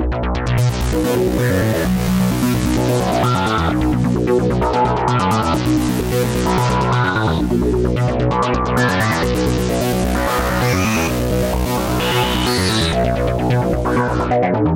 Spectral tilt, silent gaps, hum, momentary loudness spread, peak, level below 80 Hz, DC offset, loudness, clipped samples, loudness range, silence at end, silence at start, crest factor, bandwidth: -5.5 dB/octave; none; none; 2 LU; -4 dBFS; -26 dBFS; under 0.1%; -17 LUFS; under 0.1%; 1 LU; 0 s; 0 s; 12 dB; 17 kHz